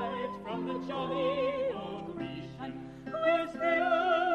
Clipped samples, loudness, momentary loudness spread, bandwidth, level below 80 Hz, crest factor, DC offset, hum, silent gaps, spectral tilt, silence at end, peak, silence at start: under 0.1%; -32 LUFS; 14 LU; 9 kHz; -62 dBFS; 16 dB; under 0.1%; none; none; -6.5 dB/octave; 0 s; -16 dBFS; 0 s